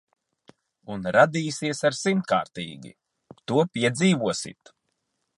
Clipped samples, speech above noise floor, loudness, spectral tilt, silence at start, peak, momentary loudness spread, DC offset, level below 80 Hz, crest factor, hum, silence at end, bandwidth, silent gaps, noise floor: under 0.1%; 53 dB; -24 LUFS; -5 dB/octave; 0.85 s; -4 dBFS; 17 LU; under 0.1%; -64 dBFS; 22 dB; none; 0.9 s; 11.5 kHz; none; -77 dBFS